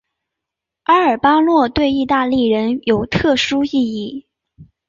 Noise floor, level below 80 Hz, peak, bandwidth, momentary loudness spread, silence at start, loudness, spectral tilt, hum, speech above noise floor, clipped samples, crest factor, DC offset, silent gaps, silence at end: -82 dBFS; -44 dBFS; -2 dBFS; 7.6 kHz; 10 LU; 0.9 s; -15 LUFS; -5.5 dB/octave; none; 67 dB; under 0.1%; 16 dB; under 0.1%; none; 0.25 s